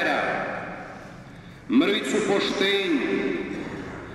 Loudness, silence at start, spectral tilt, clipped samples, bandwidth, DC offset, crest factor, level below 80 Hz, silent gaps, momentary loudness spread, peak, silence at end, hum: -24 LUFS; 0 s; -4.5 dB/octave; under 0.1%; 12.5 kHz; under 0.1%; 16 dB; -54 dBFS; none; 20 LU; -10 dBFS; 0 s; none